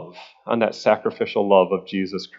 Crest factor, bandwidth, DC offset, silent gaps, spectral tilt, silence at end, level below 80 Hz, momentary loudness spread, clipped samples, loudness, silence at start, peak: 20 dB; 7.6 kHz; under 0.1%; none; -6 dB/octave; 0 s; -72 dBFS; 11 LU; under 0.1%; -21 LUFS; 0 s; 0 dBFS